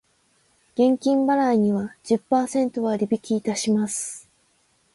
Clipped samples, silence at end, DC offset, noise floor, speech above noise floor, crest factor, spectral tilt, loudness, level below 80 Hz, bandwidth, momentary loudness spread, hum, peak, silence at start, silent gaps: under 0.1%; 0.75 s; under 0.1%; -64 dBFS; 43 dB; 16 dB; -5 dB/octave; -23 LUFS; -66 dBFS; 11.5 kHz; 8 LU; none; -8 dBFS; 0.75 s; none